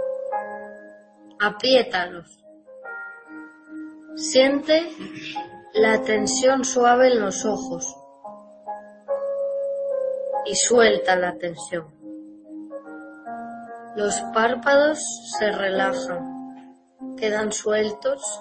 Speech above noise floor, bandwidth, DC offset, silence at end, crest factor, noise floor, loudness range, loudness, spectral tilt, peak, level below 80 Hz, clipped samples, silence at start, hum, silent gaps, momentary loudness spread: 27 dB; 8.8 kHz; under 0.1%; 0 s; 20 dB; -48 dBFS; 6 LU; -22 LUFS; -2.5 dB/octave; -4 dBFS; -62 dBFS; under 0.1%; 0 s; none; none; 22 LU